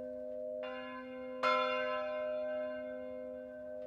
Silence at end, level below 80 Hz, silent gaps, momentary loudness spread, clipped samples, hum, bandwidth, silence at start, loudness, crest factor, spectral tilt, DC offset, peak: 0 s; -74 dBFS; none; 13 LU; under 0.1%; none; 8.6 kHz; 0 s; -38 LUFS; 20 dB; -4 dB/octave; under 0.1%; -20 dBFS